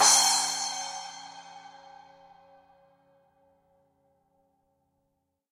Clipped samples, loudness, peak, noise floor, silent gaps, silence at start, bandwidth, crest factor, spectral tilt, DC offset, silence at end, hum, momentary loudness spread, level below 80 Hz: under 0.1%; -24 LUFS; -6 dBFS; -79 dBFS; none; 0 s; 16 kHz; 26 dB; 2 dB/octave; under 0.1%; 3.85 s; none; 29 LU; -82 dBFS